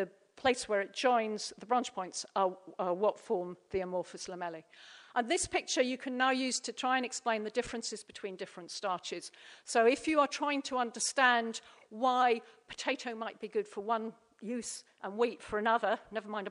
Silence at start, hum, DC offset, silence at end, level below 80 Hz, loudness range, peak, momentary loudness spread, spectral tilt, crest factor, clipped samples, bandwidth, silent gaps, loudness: 0 s; none; under 0.1%; 0 s; -68 dBFS; 5 LU; -12 dBFS; 14 LU; -2.5 dB/octave; 22 dB; under 0.1%; 11 kHz; none; -33 LUFS